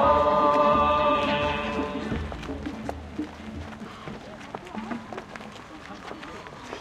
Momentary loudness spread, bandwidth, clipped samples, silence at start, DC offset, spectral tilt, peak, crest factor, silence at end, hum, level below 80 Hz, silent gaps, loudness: 20 LU; 11 kHz; under 0.1%; 0 s; under 0.1%; -6 dB/octave; -10 dBFS; 18 dB; 0 s; none; -46 dBFS; none; -25 LUFS